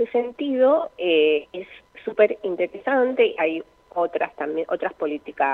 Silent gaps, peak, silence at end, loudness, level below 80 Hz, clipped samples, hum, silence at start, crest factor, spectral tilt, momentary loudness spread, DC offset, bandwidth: none; -4 dBFS; 0 s; -22 LUFS; -66 dBFS; under 0.1%; none; 0 s; 18 dB; -6.5 dB/octave; 13 LU; under 0.1%; 4.2 kHz